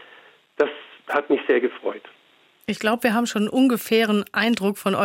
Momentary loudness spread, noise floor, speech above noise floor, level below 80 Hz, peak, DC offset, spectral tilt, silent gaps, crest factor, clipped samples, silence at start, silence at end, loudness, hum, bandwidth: 11 LU; -57 dBFS; 36 dB; -68 dBFS; -6 dBFS; under 0.1%; -5 dB/octave; none; 16 dB; under 0.1%; 0.6 s; 0 s; -22 LUFS; none; 16.5 kHz